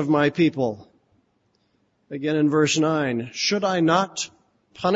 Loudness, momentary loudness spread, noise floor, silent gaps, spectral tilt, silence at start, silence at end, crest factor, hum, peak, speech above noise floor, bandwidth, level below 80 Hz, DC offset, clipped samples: -22 LUFS; 11 LU; -67 dBFS; none; -4.5 dB/octave; 0 s; 0 s; 18 dB; none; -6 dBFS; 46 dB; 8 kHz; -64 dBFS; under 0.1%; under 0.1%